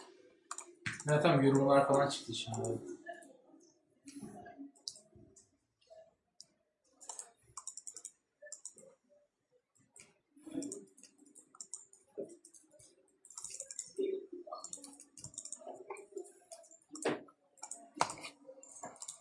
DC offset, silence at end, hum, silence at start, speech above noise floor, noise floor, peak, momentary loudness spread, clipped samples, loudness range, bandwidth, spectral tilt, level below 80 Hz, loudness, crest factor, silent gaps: under 0.1%; 0.05 s; none; 0 s; 47 dB; -78 dBFS; -10 dBFS; 26 LU; under 0.1%; 19 LU; 11.5 kHz; -5 dB/octave; -80 dBFS; -38 LUFS; 30 dB; none